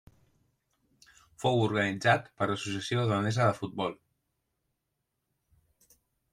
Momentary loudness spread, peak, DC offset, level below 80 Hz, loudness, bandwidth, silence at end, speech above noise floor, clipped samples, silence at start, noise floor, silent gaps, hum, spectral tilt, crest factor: 7 LU; -10 dBFS; under 0.1%; -68 dBFS; -29 LUFS; 12 kHz; 2.4 s; 54 dB; under 0.1%; 1.4 s; -83 dBFS; none; none; -5.5 dB/octave; 22 dB